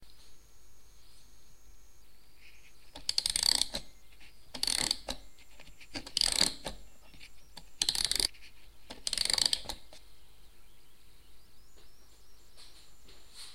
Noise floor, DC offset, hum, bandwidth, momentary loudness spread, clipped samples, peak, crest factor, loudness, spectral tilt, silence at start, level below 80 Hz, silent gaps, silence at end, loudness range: -59 dBFS; 0.4%; none; 16.5 kHz; 27 LU; under 0.1%; -8 dBFS; 30 dB; -30 LUFS; 0.5 dB/octave; 0 s; -56 dBFS; none; 0 s; 3 LU